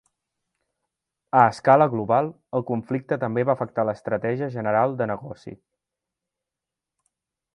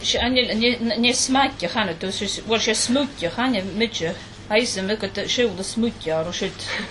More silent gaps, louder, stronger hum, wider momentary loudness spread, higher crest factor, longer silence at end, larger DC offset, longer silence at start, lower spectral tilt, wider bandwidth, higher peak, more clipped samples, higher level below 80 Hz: neither; about the same, -23 LUFS vs -22 LUFS; neither; first, 11 LU vs 7 LU; first, 24 dB vs 18 dB; first, 2 s vs 0 s; neither; first, 1.35 s vs 0 s; first, -8 dB/octave vs -3 dB/octave; about the same, 10.5 kHz vs 11.5 kHz; about the same, -2 dBFS vs -4 dBFS; neither; second, -64 dBFS vs -46 dBFS